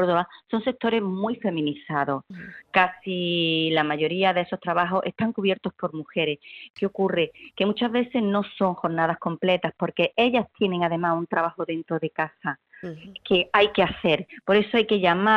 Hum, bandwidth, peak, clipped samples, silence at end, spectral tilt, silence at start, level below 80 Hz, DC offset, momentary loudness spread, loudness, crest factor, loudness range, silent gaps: none; 6.4 kHz; -2 dBFS; under 0.1%; 0 s; -7.5 dB/octave; 0 s; -60 dBFS; under 0.1%; 9 LU; -24 LUFS; 22 dB; 3 LU; 6.70-6.74 s